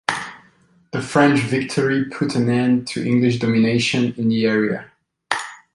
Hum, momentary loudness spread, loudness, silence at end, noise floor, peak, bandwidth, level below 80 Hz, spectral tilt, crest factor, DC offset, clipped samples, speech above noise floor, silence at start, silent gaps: none; 10 LU; -19 LUFS; 0.2 s; -55 dBFS; -2 dBFS; 11.5 kHz; -58 dBFS; -6 dB/octave; 18 dB; under 0.1%; under 0.1%; 37 dB; 0.1 s; none